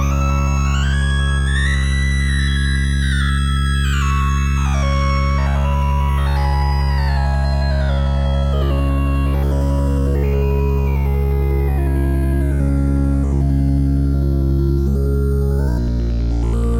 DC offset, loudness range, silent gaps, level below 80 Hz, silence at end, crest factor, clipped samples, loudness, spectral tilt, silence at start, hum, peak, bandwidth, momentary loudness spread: under 0.1%; 1 LU; none; -18 dBFS; 0 s; 10 dB; under 0.1%; -18 LUFS; -6.5 dB/octave; 0 s; none; -6 dBFS; 10.5 kHz; 1 LU